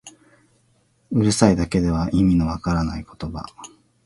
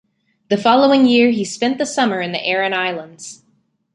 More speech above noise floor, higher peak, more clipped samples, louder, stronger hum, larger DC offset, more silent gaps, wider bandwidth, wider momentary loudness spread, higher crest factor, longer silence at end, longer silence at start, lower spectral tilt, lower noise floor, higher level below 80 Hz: second, 42 dB vs 46 dB; about the same, 0 dBFS vs -2 dBFS; neither; second, -20 LUFS vs -16 LUFS; neither; neither; neither; about the same, 11.5 kHz vs 11 kHz; about the same, 16 LU vs 17 LU; first, 22 dB vs 16 dB; second, 0.4 s vs 0.6 s; second, 0.05 s vs 0.5 s; first, -6 dB/octave vs -4 dB/octave; about the same, -62 dBFS vs -62 dBFS; first, -36 dBFS vs -64 dBFS